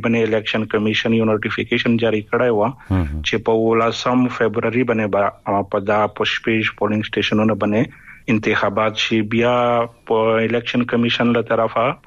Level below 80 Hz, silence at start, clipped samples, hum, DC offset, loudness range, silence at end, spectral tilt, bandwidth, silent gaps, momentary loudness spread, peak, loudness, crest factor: -42 dBFS; 0 s; under 0.1%; none; under 0.1%; 1 LU; 0.1 s; -6 dB/octave; 7.4 kHz; none; 4 LU; -4 dBFS; -18 LUFS; 12 dB